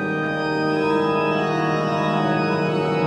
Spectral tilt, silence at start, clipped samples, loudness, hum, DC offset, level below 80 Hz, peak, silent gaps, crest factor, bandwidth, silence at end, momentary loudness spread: -7 dB/octave; 0 s; under 0.1%; -21 LUFS; none; under 0.1%; -58 dBFS; -8 dBFS; none; 12 dB; 10.5 kHz; 0 s; 2 LU